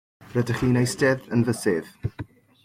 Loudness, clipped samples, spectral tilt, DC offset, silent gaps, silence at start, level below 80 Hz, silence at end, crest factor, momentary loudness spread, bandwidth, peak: -24 LUFS; under 0.1%; -6 dB/octave; under 0.1%; none; 0.2 s; -50 dBFS; 0.4 s; 16 dB; 13 LU; 16 kHz; -8 dBFS